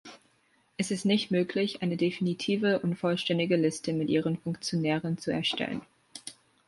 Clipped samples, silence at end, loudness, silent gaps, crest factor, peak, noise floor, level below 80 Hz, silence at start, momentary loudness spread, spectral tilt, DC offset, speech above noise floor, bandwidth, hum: under 0.1%; 0.35 s; -29 LUFS; none; 16 dB; -14 dBFS; -68 dBFS; -68 dBFS; 0.05 s; 14 LU; -5.5 dB/octave; under 0.1%; 40 dB; 11.5 kHz; none